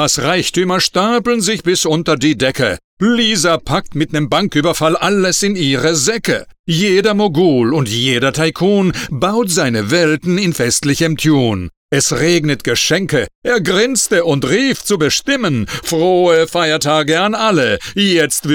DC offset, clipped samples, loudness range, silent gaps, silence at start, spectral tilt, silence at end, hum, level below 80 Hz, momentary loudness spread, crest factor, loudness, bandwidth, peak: under 0.1%; under 0.1%; 1 LU; 2.84-2.97 s, 6.59-6.64 s, 11.77-11.89 s, 13.35-13.42 s; 0 s; -4 dB/octave; 0 s; none; -42 dBFS; 5 LU; 12 dB; -14 LUFS; 19.5 kHz; -2 dBFS